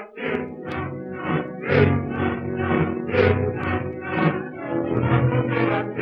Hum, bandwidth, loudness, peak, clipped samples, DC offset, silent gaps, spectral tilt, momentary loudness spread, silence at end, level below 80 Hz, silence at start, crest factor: none; 5.6 kHz; -23 LUFS; -4 dBFS; under 0.1%; under 0.1%; none; -10 dB/octave; 10 LU; 0 s; -46 dBFS; 0 s; 18 dB